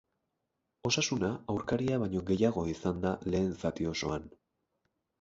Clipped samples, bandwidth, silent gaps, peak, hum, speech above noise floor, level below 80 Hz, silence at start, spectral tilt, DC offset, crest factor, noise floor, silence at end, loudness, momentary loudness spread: under 0.1%; 7.8 kHz; none; -14 dBFS; none; 52 dB; -54 dBFS; 0.85 s; -5 dB/octave; under 0.1%; 20 dB; -84 dBFS; 0.95 s; -32 LUFS; 6 LU